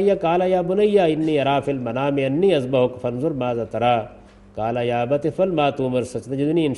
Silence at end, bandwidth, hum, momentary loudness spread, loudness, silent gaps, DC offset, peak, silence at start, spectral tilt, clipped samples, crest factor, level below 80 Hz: 0 s; 11.5 kHz; none; 7 LU; -21 LUFS; none; under 0.1%; -6 dBFS; 0 s; -7 dB/octave; under 0.1%; 16 dB; -52 dBFS